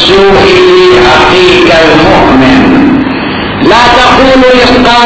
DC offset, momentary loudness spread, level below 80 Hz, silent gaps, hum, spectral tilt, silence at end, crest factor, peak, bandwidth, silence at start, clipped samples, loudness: under 0.1%; 5 LU; -24 dBFS; none; none; -5 dB/octave; 0 s; 2 dB; 0 dBFS; 8 kHz; 0 s; 20%; -3 LUFS